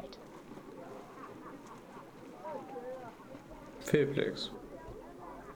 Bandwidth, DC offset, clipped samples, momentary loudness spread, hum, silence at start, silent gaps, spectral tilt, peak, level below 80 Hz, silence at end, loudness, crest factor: over 20 kHz; under 0.1%; under 0.1%; 19 LU; none; 0 s; none; -5.5 dB/octave; -14 dBFS; -64 dBFS; 0 s; -39 LUFS; 26 dB